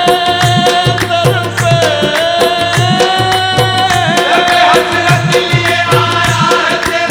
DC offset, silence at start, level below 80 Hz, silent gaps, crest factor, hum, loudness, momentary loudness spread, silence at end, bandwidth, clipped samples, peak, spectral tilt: under 0.1%; 0 s; -38 dBFS; none; 10 dB; none; -9 LUFS; 3 LU; 0 s; 18.5 kHz; under 0.1%; 0 dBFS; -4 dB/octave